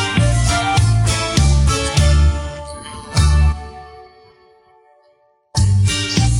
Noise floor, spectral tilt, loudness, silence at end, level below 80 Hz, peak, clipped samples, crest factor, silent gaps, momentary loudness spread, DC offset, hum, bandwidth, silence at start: -57 dBFS; -4.5 dB/octave; -16 LUFS; 0 s; -20 dBFS; -2 dBFS; under 0.1%; 14 dB; none; 15 LU; under 0.1%; none; 11.5 kHz; 0 s